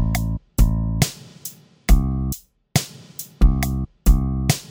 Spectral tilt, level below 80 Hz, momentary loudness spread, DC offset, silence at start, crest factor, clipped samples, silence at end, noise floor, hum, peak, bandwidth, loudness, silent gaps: -5 dB/octave; -22 dBFS; 15 LU; under 0.1%; 0 s; 20 dB; under 0.1%; 0.05 s; -40 dBFS; none; 0 dBFS; over 20 kHz; -22 LUFS; none